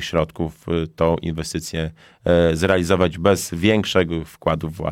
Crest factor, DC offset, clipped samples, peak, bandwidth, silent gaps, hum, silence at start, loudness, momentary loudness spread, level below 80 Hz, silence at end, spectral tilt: 16 dB; under 0.1%; under 0.1%; -4 dBFS; 16.5 kHz; none; none; 0 s; -20 LUFS; 10 LU; -40 dBFS; 0 s; -5.5 dB/octave